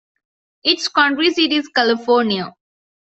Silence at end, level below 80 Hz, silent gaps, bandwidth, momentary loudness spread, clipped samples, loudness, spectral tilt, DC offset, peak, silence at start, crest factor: 0.65 s; -64 dBFS; none; 8.2 kHz; 6 LU; under 0.1%; -16 LUFS; -3.5 dB/octave; under 0.1%; -2 dBFS; 0.65 s; 18 dB